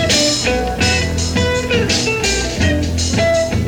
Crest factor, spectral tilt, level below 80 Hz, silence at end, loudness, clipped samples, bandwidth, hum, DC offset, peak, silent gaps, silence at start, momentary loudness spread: 14 dB; -3.5 dB/octave; -26 dBFS; 0 s; -15 LUFS; under 0.1%; 18 kHz; none; under 0.1%; -2 dBFS; none; 0 s; 3 LU